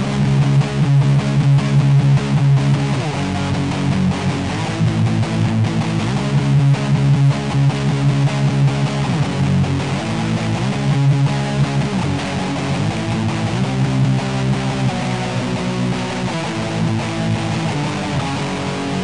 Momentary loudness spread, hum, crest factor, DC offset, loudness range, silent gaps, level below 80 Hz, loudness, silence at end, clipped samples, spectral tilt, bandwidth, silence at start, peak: 6 LU; none; 10 dB; 0.7%; 4 LU; none; -40 dBFS; -17 LUFS; 0 s; under 0.1%; -6.5 dB/octave; 10.5 kHz; 0 s; -6 dBFS